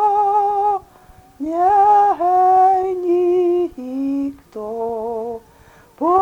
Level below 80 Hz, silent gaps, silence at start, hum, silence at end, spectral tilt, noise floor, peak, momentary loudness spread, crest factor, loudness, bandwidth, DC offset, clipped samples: -54 dBFS; none; 0 s; none; 0 s; -7 dB/octave; -48 dBFS; -4 dBFS; 15 LU; 12 dB; -17 LUFS; 7.8 kHz; under 0.1%; under 0.1%